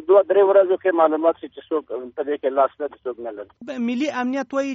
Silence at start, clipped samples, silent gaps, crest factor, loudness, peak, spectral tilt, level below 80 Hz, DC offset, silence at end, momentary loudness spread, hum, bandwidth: 0 s; under 0.1%; none; 16 dB; -20 LUFS; -4 dBFS; -3 dB/octave; -70 dBFS; under 0.1%; 0 s; 16 LU; none; 7.6 kHz